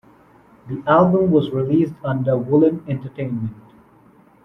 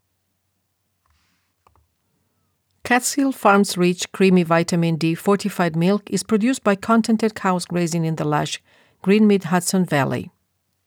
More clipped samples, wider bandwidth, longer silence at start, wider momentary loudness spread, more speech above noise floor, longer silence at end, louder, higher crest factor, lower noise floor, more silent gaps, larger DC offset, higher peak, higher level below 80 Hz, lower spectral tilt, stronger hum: neither; second, 5.6 kHz vs 18.5 kHz; second, 0.65 s vs 2.85 s; first, 13 LU vs 7 LU; second, 33 dB vs 53 dB; first, 0.9 s vs 0.6 s; about the same, -19 LUFS vs -19 LUFS; about the same, 16 dB vs 16 dB; second, -51 dBFS vs -71 dBFS; neither; neither; about the same, -2 dBFS vs -4 dBFS; first, -54 dBFS vs -64 dBFS; first, -10.5 dB/octave vs -5.5 dB/octave; neither